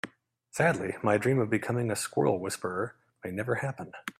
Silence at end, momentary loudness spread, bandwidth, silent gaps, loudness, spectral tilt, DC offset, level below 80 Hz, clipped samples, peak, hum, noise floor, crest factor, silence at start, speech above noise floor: 0.1 s; 12 LU; 15.5 kHz; none; -30 LUFS; -5.5 dB/octave; under 0.1%; -68 dBFS; under 0.1%; -12 dBFS; none; -57 dBFS; 18 dB; 0.05 s; 28 dB